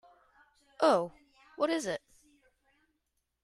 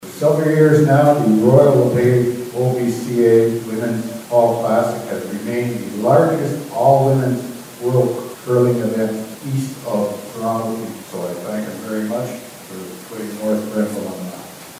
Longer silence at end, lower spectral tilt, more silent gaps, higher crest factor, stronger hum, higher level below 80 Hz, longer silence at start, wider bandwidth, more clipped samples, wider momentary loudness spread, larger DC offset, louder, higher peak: first, 1.45 s vs 0 s; second, -4 dB/octave vs -7 dB/octave; neither; first, 22 dB vs 16 dB; neither; second, -76 dBFS vs -60 dBFS; first, 0.8 s vs 0 s; second, 13.5 kHz vs 16 kHz; neither; about the same, 13 LU vs 15 LU; neither; second, -31 LUFS vs -17 LUFS; second, -14 dBFS vs 0 dBFS